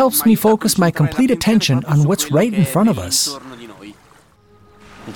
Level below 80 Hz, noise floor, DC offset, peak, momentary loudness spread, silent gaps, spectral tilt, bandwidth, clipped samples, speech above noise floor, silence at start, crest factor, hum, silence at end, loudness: -48 dBFS; -50 dBFS; under 0.1%; -2 dBFS; 12 LU; none; -5 dB/octave; 18 kHz; under 0.1%; 35 dB; 0 s; 14 dB; none; 0 s; -15 LUFS